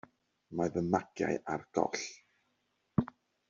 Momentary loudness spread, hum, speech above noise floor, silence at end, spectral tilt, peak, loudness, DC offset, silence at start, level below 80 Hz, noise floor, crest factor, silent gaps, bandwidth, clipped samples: 9 LU; none; 45 dB; 0.45 s; -6 dB/octave; -14 dBFS; -35 LUFS; under 0.1%; 0.5 s; -66 dBFS; -79 dBFS; 22 dB; none; 7.6 kHz; under 0.1%